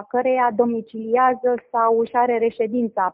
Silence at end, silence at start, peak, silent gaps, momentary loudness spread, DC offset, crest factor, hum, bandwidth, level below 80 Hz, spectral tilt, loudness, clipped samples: 0 s; 0 s; -4 dBFS; none; 4 LU; under 0.1%; 16 dB; none; 4 kHz; -66 dBFS; -5 dB/octave; -20 LUFS; under 0.1%